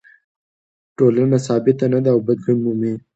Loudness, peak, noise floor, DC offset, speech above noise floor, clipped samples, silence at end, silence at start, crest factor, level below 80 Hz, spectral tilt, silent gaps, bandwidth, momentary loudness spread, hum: -17 LUFS; -2 dBFS; under -90 dBFS; under 0.1%; over 74 dB; under 0.1%; 0.15 s; 1 s; 16 dB; -62 dBFS; -8.5 dB/octave; none; 8.2 kHz; 4 LU; none